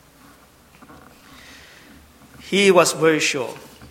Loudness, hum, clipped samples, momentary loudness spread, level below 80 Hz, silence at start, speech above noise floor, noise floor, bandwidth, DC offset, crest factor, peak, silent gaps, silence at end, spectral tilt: -17 LUFS; none; under 0.1%; 16 LU; -58 dBFS; 2.45 s; 33 dB; -51 dBFS; 16.5 kHz; under 0.1%; 22 dB; 0 dBFS; none; 0.05 s; -3.5 dB/octave